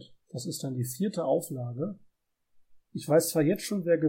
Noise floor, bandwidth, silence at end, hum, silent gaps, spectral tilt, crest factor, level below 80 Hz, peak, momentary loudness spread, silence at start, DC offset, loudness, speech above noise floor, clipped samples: -67 dBFS; 16.5 kHz; 0 s; none; none; -5.5 dB/octave; 18 dB; -72 dBFS; -12 dBFS; 15 LU; 0 s; under 0.1%; -29 LUFS; 38 dB; under 0.1%